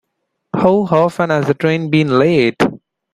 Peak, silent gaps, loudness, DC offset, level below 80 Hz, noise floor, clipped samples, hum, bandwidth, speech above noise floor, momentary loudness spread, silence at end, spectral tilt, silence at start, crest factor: 0 dBFS; none; -14 LUFS; under 0.1%; -52 dBFS; -72 dBFS; under 0.1%; none; 13 kHz; 59 dB; 5 LU; 0.35 s; -7.5 dB/octave; 0.55 s; 14 dB